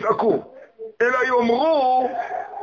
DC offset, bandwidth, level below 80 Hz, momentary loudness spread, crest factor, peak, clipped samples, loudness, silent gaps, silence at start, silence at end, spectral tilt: under 0.1%; 7.2 kHz; -62 dBFS; 11 LU; 14 dB; -6 dBFS; under 0.1%; -20 LUFS; none; 0 s; 0 s; -5.5 dB/octave